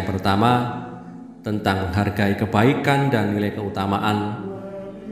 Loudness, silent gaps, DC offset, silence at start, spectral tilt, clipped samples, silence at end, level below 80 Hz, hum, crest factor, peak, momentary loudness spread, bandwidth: -21 LUFS; none; under 0.1%; 0 s; -7 dB/octave; under 0.1%; 0 s; -42 dBFS; none; 20 dB; -2 dBFS; 16 LU; 15.5 kHz